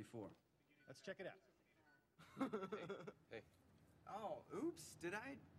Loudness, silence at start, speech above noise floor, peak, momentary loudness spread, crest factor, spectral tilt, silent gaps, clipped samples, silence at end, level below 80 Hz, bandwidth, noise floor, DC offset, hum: -52 LUFS; 0 s; 24 dB; -32 dBFS; 16 LU; 22 dB; -5 dB/octave; none; under 0.1%; 0 s; -84 dBFS; 15.5 kHz; -76 dBFS; under 0.1%; none